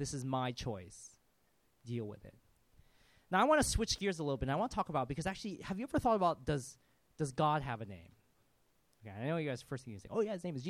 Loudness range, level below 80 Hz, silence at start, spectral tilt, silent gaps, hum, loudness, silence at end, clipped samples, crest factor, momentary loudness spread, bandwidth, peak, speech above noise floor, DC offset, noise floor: 6 LU; -54 dBFS; 0 s; -5 dB/octave; none; none; -36 LUFS; 0 s; under 0.1%; 20 dB; 19 LU; 15.5 kHz; -18 dBFS; 39 dB; under 0.1%; -76 dBFS